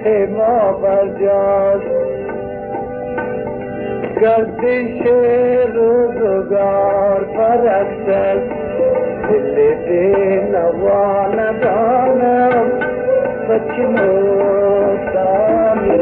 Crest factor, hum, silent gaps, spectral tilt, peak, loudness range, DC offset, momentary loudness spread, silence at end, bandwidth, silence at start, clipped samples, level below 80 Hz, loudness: 12 dB; none; none; -11.5 dB/octave; -2 dBFS; 4 LU; under 0.1%; 8 LU; 0 s; 4.2 kHz; 0 s; under 0.1%; -44 dBFS; -15 LUFS